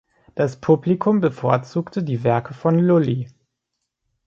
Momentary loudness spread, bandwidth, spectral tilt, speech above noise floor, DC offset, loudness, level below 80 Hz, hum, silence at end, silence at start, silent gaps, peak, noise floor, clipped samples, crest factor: 9 LU; 7.2 kHz; -9 dB/octave; 60 dB; under 0.1%; -20 LUFS; -60 dBFS; none; 1 s; 0.35 s; none; -2 dBFS; -79 dBFS; under 0.1%; 18 dB